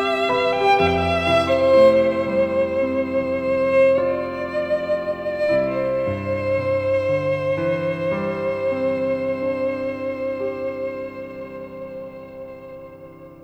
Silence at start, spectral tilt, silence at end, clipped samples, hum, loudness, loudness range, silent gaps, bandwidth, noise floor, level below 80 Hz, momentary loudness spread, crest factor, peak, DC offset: 0 s; -6.5 dB/octave; 0 s; under 0.1%; none; -20 LUFS; 9 LU; none; 8.6 kHz; -41 dBFS; -50 dBFS; 17 LU; 16 dB; -4 dBFS; under 0.1%